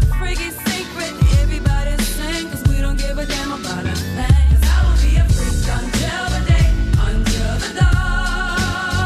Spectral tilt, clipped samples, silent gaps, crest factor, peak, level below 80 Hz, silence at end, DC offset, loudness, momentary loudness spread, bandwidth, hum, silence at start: -5 dB/octave; under 0.1%; none; 12 dB; -2 dBFS; -18 dBFS; 0 s; under 0.1%; -18 LUFS; 7 LU; 14.5 kHz; none; 0 s